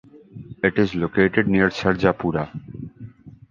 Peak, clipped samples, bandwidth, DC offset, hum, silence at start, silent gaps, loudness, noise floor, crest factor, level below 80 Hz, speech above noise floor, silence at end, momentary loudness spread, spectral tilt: -2 dBFS; under 0.1%; 7.2 kHz; under 0.1%; none; 0.15 s; none; -21 LUFS; -41 dBFS; 20 dB; -46 dBFS; 21 dB; 0.2 s; 21 LU; -7.5 dB/octave